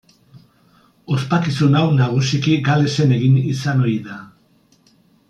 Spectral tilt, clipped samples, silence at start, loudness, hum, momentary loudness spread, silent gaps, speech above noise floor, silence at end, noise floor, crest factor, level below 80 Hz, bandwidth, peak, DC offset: -6.5 dB/octave; under 0.1%; 0.35 s; -17 LUFS; none; 9 LU; none; 40 dB; 1.05 s; -56 dBFS; 14 dB; -56 dBFS; 9 kHz; -4 dBFS; under 0.1%